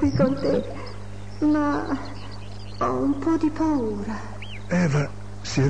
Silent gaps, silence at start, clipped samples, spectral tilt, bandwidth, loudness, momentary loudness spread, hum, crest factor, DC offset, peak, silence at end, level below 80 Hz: none; 0 s; under 0.1%; -7 dB/octave; 9.8 kHz; -24 LUFS; 16 LU; 50 Hz at -40 dBFS; 16 dB; 2%; -8 dBFS; 0 s; -44 dBFS